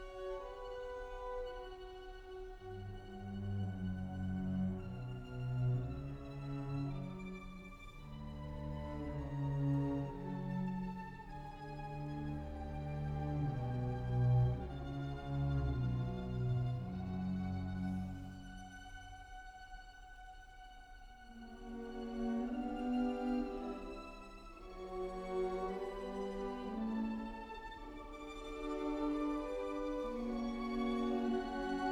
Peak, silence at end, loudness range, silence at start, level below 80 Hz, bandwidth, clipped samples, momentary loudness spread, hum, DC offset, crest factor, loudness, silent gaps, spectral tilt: -24 dBFS; 0 s; 8 LU; 0 s; -52 dBFS; 9.6 kHz; under 0.1%; 15 LU; none; under 0.1%; 16 dB; -41 LUFS; none; -8.5 dB/octave